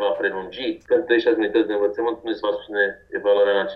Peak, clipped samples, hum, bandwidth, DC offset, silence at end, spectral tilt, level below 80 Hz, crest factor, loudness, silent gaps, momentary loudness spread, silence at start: -6 dBFS; under 0.1%; none; 5.8 kHz; under 0.1%; 0 s; -6.5 dB/octave; -60 dBFS; 16 dB; -22 LUFS; none; 7 LU; 0 s